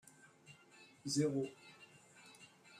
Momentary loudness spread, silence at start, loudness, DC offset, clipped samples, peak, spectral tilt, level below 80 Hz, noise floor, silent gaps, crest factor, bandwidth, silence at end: 25 LU; 0.5 s; -39 LUFS; under 0.1%; under 0.1%; -24 dBFS; -5 dB/octave; -84 dBFS; -64 dBFS; none; 20 dB; 15 kHz; 0 s